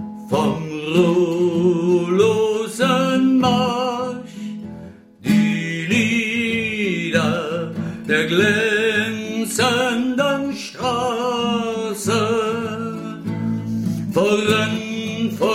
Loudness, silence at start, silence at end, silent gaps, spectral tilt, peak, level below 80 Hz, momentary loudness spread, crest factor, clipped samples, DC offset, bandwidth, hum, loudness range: -19 LUFS; 0 s; 0 s; none; -5 dB/octave; -4 dBFS; -56 dBFS; 10 LU; 16 dB; under 0.1%; under 0.1%; 16 kHz; none; 4 LU